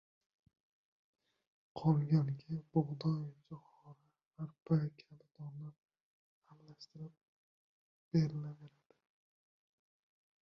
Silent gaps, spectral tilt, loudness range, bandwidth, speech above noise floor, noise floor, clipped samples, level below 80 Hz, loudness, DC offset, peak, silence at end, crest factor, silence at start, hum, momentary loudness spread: 4.26-4.31 s, 5.78-5.83 s, 6.00-6.42 s, 7.23-8.11 s; -9.5 dB/octave; 6 LU; 6.2 kHz; 26 dB; -62 dBFS; under 0.1%; -74 dBFS; -37 LUFS; under 0.1%; -20 dBFS; 1.75 s; 22 dB; 1.75 s; none; 21 LU